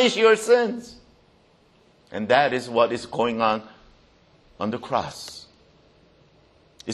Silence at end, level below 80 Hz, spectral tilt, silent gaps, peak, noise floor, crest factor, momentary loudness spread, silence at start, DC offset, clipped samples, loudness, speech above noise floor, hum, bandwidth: 0 s; -62 dBFS; -4 dB/octave; none; -4 dBFS; -58 dBFS; 22 dB; 19 LU; 0 s; under 0.1%; under 0.1%; -22 LUFS; 37 dB; none; 12.5 kHz